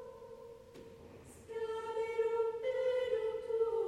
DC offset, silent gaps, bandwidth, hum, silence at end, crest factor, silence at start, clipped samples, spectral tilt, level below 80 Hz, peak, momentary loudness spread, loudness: under 0.1%; none; 11.5 kHz; none; 0 s; 14 dB; 0 s; under 0.1%; -4.5 dB/octave; -70 dBFS; -24 dBFS; 20 LU; -37 LUFS